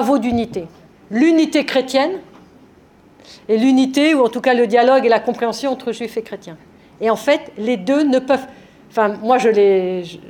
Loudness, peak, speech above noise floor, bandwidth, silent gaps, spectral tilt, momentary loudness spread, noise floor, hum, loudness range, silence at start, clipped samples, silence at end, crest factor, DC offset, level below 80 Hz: -16 LUFS; -2 dBFS; 32 dB; 17 kHz; none; -5 dB/octave; 12 LU; -48 dBFS; none; 4 LU; 0 s; under 0.1%; 0 s; 16 dB; under 0.1%; -56 dBFS